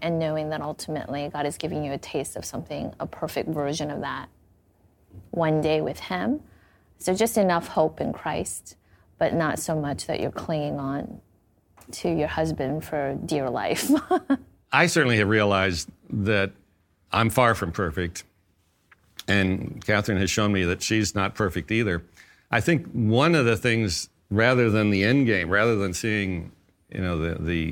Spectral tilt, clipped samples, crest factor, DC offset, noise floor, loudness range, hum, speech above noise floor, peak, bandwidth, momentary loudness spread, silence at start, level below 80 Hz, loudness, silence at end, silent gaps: -5 dB/octave; under 0.1%; 22 dB; under 0.1%; -66 dBFS; 8 LU; none; 42 dB; -4 dBFS; 17.5 kHz; 12 LU; 0 s; -50 dBFS; -25 LUFS; 0 s; none